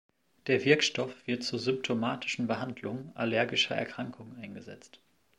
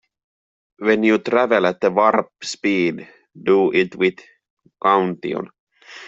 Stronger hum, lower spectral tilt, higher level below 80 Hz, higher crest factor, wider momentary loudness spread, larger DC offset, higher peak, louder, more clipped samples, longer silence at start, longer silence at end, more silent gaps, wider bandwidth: neither; second, -4 dB/octave vs -5.5 dB/octave; second, -76 dBFS vs -64 dBFS; about the same, 24 dB vs 20 dB; first, 19 LU vs 11 LU; neither; second, -8 dBFS vs 0 dBFS; second, -30 LUFS vs -19 LUFS; neither; second, 0.45 s vs 0.8 s; first, 0.4 s vs 0 s; second, none vs 4.50-4.57 s, 5.59-5.67 s; first, 11.5 kHz vs 7.8 kHz